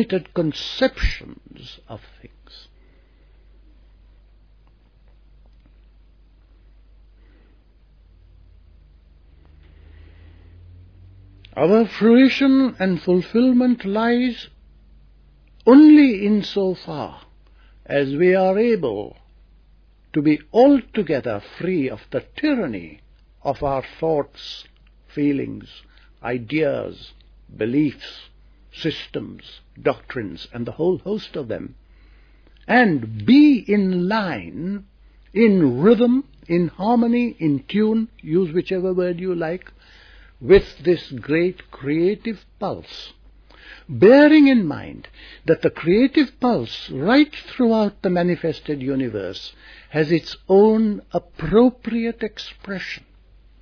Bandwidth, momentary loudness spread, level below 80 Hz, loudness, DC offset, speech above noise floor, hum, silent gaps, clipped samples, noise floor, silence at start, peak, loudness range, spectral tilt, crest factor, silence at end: 5.4 kHz; 19 LU; -44 dBFS; -19 LUFS; under 0.1%; 34 dB; none; none; under 0.1%; -52 dBFS; 0 s; -2 dBFS; 10 LU; -8 dB/octave; 18 dB; 0.65 s